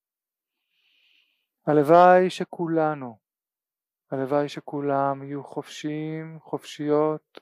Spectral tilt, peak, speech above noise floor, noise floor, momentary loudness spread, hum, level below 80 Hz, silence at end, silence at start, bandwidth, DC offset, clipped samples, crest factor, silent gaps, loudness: -7 dB/octave; -4 dBFS; over 67 dB; under -90 dBFS; 19 LU; none; -80 dBFS; 0.25 s; 1.65 s; 14.5 kHz; under 0.1%; under 0.1%; 22 dB; none; -23 LUFS